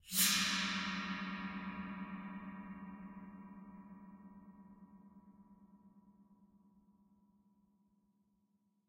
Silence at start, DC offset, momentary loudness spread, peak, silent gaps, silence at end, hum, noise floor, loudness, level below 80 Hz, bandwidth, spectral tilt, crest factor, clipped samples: 0.05 s; under 0.1%; 28 LU; -18 dBFS; none; 2.3 s; none; -79 dBFS; -38 LUFS; -72 dBFS; 16 kHz; -1.5 dB/octave; 26 dB; under 0.1%